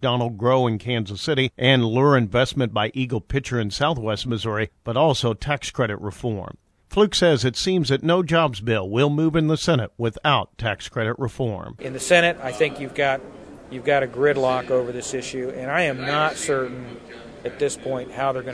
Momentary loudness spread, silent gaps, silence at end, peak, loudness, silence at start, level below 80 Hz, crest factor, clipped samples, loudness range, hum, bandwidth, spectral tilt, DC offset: 11 LU; none; 0 s; -2 dBFS; -22 LUFS; 0 s; -48 dBFS; 20 dB; under 0.1%; 4 LU; none; 11 kHz; -5 dB/octave; under 0.1%